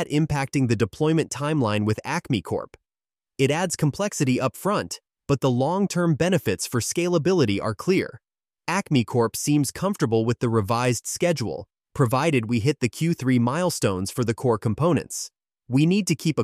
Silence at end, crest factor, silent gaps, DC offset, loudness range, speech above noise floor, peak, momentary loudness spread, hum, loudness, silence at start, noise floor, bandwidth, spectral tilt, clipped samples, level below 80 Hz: 0 s; 16 dB; none; under 0.1%; 2 LU; over 67 dB; -8 dBFS; 6 LU; none; -23 LUFS; 0 s; under -90 dBFS; 15.5 kHz; -5.5 dB/octave; under 0.1%; -54 dBFS